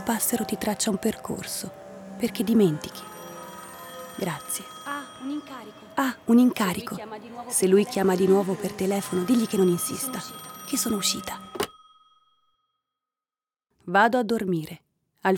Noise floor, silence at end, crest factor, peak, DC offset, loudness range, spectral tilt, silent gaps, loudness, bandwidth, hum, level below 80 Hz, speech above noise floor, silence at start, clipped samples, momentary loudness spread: under -90 dBFS; 0 s; 18 dB; -8 dBFS; under 0.1%; 8 LU; -4.5 dB/octave; none; -25 LUFS; over 20 kHz; none; -64 dBFS; over 65 dB; 0 s; under 0.1%; 19 LU